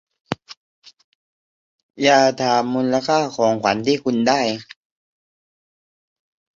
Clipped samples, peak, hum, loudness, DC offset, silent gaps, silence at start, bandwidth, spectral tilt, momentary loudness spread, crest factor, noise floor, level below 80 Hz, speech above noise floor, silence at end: under 0.1%; -2 dBFS; none; -18 LUFS; under 0.1%; 0.57-0.82 s, 1.04-1.89 s; 0.3 s; 7.6 kHz; -4.5 dB/octave; 15 LU; 20 dB; under -90 dBFS; -62 dBFS; over 72 dB; 1.95 s